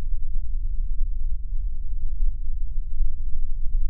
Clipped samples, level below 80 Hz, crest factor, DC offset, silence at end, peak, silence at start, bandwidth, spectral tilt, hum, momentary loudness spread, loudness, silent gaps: under 0.1%; -22 dBFS; 10 dB; under 0.1%; 0 s; -8 dBFS; 0 s; 0.3 kHz; -15 dB/octave; none; 3 LU; -33 LUFS; none